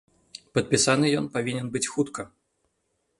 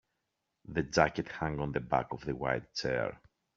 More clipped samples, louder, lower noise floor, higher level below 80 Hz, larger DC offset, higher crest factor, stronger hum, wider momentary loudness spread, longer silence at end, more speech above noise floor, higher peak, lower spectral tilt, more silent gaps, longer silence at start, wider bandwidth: neither; first, -25 LUFS vs -33 LUFS; second, -75 dBFS vs -84 dBFS; second, -62 dBFS vs -56 dBFS; neither; about the same, 22 dB vs 26 dB; neither; first, 21 LU vs 8 LU; first, 0.9 s vs 0.4 s; about the same, 50 dB vs 51 dB; about the same, -6 dBFS vs -8 dBFS; about the same, -4 dB/octave vs -4.5 dB/octave; neither; second, 0.35 s vs 0.7 s; first, 11.5 kHz vs 7.4 kHz